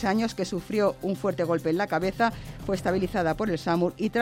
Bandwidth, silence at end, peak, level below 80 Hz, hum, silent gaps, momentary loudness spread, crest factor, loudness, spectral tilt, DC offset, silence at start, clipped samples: 16.5 kHz; 0 s; -12 dBFS; -48 dBFS; none; none; 3 LU; 16 dB; -27 LUFS; -6 dB/octave; under 0.1%; 0 s; under 0.1%